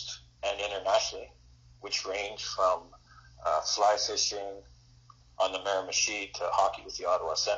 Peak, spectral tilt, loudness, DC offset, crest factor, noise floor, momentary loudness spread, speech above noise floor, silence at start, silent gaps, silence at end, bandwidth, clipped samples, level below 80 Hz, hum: -12 dBFS; 1 dB/octave; -30 LUFS; under 0.1%; 20 dB; -58 dBFS; 12 LU; 27 dB; 0 s; none; 0 s; 7.6 kHz; under 0.1%; -60 dBFS; none